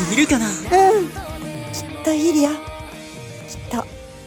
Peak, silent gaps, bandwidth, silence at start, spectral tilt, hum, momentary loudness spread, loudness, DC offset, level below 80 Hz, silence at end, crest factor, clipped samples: -2 dBFS; none; 17.5 kHz; 0 s; -4 dB/octave; none; 20 LU; -19 LUFS; under 0.1%; -42 dBFS; 0 s; 18 dB; under 0.1%